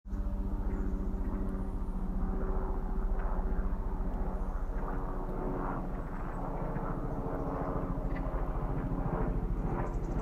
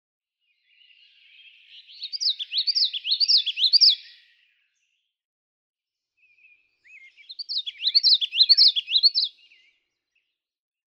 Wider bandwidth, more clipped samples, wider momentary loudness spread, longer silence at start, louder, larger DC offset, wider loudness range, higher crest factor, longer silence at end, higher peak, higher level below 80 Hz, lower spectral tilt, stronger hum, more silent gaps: second, 3.1 kHz vs 16 kHz; neither; second, 4 LU vs 14 LU; second, 0.05 s vs 2 s; second, -37 LUFS vs -18 LUFS; neither; second, 2 LU vs 8 LU; second, 12 dB vs 20 dB; second, 0 s vs 1.7 s; second, -22 dBFS vs -6 dBFS; first, -34 dBFS vs under -90 dBFS; first, -9.5 dB/octave vs 8.5 dB/octave; neither; second, none vs 5.25-5.74 s